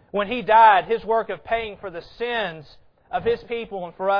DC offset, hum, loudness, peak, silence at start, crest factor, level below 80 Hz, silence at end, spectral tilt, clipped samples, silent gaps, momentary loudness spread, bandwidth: under 0.1%; none; -21 LUFS; -2 dBFS; 0.15 s; 20 dB; -52 dBFS; 0 s; -6.5 dB/octave; under 0.1%; none; 18 LU; 5.4 kHz